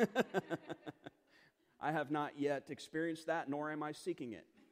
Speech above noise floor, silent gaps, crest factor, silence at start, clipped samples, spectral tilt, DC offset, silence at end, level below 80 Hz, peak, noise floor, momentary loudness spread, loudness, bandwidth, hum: 31 dB; none; 22 dB; 0 s; under 0.1%; -5.5 dB/octave; under 0.1%; 0.3 s; -84 dBFS; -18 dBFS; -70 dBFS; 13 LU; -41 LUFS; 15.5 kHz; none